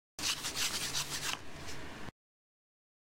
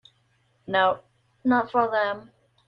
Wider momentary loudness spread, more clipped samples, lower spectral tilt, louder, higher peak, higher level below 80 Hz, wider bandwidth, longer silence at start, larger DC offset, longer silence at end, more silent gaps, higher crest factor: first, 14 LU vs 10 LU; neither; second, -0.5 dB/octave vs -7 dB/octave; second, -36 LUFS vs -24 LUFS; second, -20 dBFS vs -8 dBFS; first, -60 dBFS vs -68 dBFS; first, 16 kHz vs 5.6 kHz; second, 0.2 s vs 0.7 s; neither; first, 0.9 s vs 0.45 s; neither; about the same, 20 dB vs 18 dB